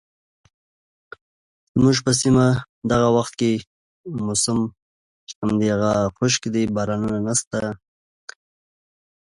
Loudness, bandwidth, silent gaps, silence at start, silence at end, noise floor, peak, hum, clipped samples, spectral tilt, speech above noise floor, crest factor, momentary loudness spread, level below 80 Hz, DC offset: -21 LUFS; 11.5 kHz; 2.69-2.82 s, 3.67-4.04 s, 4.82-5.27 s, 5.35-5.42 s, 7.47-7.51 s; 1.75 s; 1.6 s; under -90 dBFS; -4 dBFS; none; under 0.1%; -5 dB/octave; over 70 dB; 18 dB; 15 LU; -48 dBFS; under 0.1%